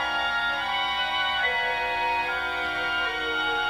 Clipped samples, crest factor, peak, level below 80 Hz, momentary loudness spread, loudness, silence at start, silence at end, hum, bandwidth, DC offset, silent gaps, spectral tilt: under 0.1%; 12 dB; -14 dBFS; -52 dBFS; 3 LU; -25 LUFS; 0 s; 0 s; 60 Hz at -55 dBFS; 18 kHz; under 0.1%; none; -2 dB/octave